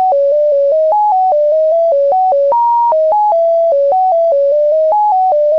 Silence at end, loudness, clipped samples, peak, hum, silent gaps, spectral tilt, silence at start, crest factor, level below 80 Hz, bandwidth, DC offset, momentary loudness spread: 0 s; -11 LUFS; under 0.1%; -8 dBFS; none; none; -5 dB/octave; 0 s; 2 dB; -66 dBFS; 6 kHz; 0.4%; 0 LU